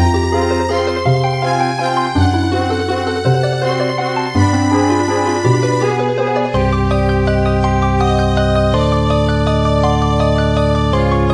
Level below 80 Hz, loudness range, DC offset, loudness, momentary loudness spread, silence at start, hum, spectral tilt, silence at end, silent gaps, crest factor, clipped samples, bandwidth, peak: -24 dBFS; 1 LU; 0.2%; -15 LUFS; 3 LU; 0 s; none; -6.5 dB/octave; 0 s; none; 14 dB; under 0.1%; 11 kHz; 0 dBFS